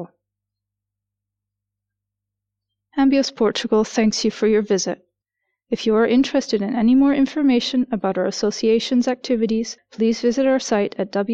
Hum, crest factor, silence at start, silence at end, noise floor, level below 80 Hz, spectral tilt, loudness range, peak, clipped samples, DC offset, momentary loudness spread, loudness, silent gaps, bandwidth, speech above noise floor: 50 Hz at -55 dBFS; 12 dB; 0 s; 0 s; -83 dBFS; -54 dBFS; -4.5 dB/octave; 5 LU; -8 dBFS; under 0.1%; under 0.1%; 7 LU; -19 LUFS; none; 8.2 kHz; 64 dB